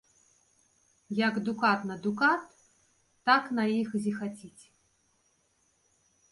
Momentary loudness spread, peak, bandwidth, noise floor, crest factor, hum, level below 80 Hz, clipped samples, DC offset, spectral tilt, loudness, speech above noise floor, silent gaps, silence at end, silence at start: 11 LU; -10 dBFS; 11.5 kHz; -71 dBFS; 22 dB; none; -76 dBFS; under 0.1%; under 0.1%; -5.5 dB/octave; -29 LUFS; 43 dB; none; 1.8 s; 1.1 s